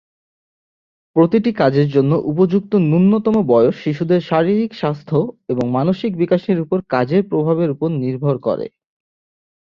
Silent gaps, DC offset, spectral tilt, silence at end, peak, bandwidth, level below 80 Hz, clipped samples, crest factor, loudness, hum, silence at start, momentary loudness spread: none; under 0.1%; -9.5 dB/octave; 1.05 s; -2 dBFS; 6.6 kHz; -56 dBFS; under 0.1%; 16 dB; -17 LUFS; none; 1.15 s; 7 LU